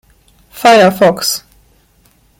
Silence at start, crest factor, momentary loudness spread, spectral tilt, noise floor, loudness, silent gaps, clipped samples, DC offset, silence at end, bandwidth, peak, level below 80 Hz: 0.55 s; 14 dB; 9 LU; -3.5 dB/octave; -51 dBFS; -10 LUFS; none; under 0.1%; under 0.1%; 1 s; 17 kHz; 0 dBFS; -52 dBFS